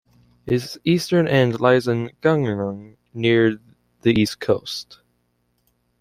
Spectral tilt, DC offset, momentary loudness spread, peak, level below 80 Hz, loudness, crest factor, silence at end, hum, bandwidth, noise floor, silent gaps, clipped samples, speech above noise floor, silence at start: -6.5 dB/octave; under 0.1%; 14 LU; -2 dBFS; -56 dBFS; -20 LUFS; 18 dB; 1.05 s; 60 Hz at -45 dBFS; 15.5 kHz; -68 dBFS; none; under 0.1%; 49 dB; 0.45 s